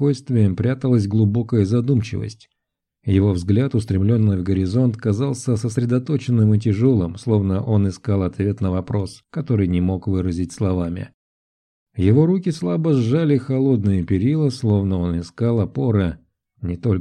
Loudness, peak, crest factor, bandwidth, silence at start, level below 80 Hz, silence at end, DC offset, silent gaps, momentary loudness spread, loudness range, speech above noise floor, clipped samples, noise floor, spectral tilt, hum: -20 LUFS; -4 dBFS; 16 dB; 10.5 kHz; 0 s; -46 dBFS; 0 s; under 0.1%; 11.14-11.86 s; 8 LU; 3 LU; 62 dB; under 0.1%; -80 dBFS; -8.5 dB/octave; none